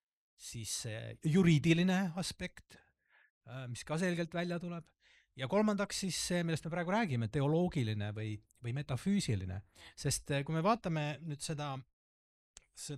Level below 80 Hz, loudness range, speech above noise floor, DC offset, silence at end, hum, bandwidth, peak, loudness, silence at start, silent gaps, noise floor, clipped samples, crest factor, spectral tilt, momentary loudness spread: -62 dBFS; 4 LU; over 55 dB; under 0.1%; 0 s; none; 14 kHz; -16 dBFS; -35 LUFS; 0.4 s; 3.30-3.41 s, 11.93-12.54 s; under -90 dBFS; under 0.1%; 20 dB; -5.5 dB/octave; 15 LU